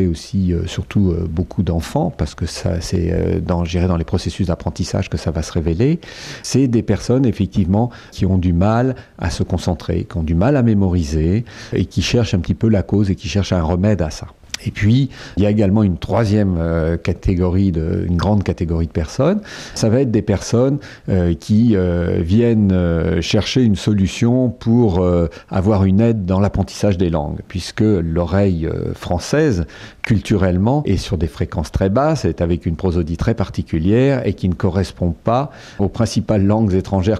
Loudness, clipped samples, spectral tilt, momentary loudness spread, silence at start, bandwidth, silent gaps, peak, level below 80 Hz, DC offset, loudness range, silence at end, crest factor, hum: -17 LUFS; under 0.1%; -7 dB/octave; 7 LU; 0 s; 12.5 kHz; none; -4 dBFS; -32 dBFS; under 0.1%; 4 LU; 0 s; 12 dB; none